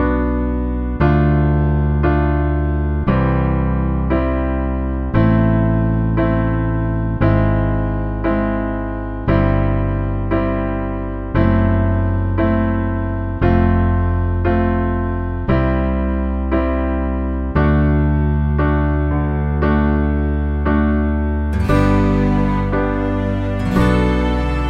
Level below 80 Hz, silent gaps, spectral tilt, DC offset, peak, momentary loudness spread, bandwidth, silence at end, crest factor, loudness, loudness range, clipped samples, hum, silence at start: -22 dBFS; none; -9.5 dB/octave; under 0.1%; 0 dBFS; 6 LU; 5.6 kHz; 0 s; 16 dB; -17 LUFS; 2 LU; under 0.1%; none; 0 s